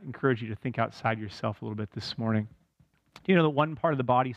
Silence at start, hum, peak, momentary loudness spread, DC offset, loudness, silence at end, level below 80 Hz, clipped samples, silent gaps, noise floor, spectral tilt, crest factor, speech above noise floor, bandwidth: 0 s; none; -10 dBFS; 12 LU; under 0.1%; -29 LUFS; 0 s; -64 dBFS; under 0.1%; none; -67 dBFS; -7.5 dB/octave; 18 dB; 39 dB; 9.4 kHz